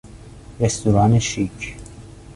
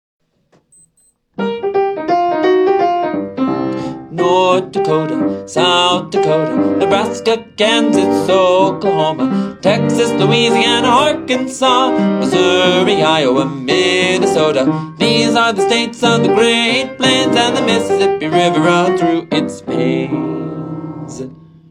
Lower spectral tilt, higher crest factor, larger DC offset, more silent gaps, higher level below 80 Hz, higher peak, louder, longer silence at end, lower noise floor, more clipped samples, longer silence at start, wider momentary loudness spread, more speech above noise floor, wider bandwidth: about the same, -5.5 dB/octave vs -4.5 dB/octave; about the same, 18 dB vs 14 dB; neither; neither; first, -40 dBFS vs -56 dBFS; second, -4 dBFS vs 0 dBFS; second, -19 LUFS vs -13 LUFS; second, 0.05 s vs 0.35 s; second, -40 dBFS vs -57 dBFS; neither; second, 0.05 s vs 1.4 s; first, 20 LU vs 8 LU; second, 22 dB vs 44 dB; about the same, 11.5 kHz vs 12.5 kHz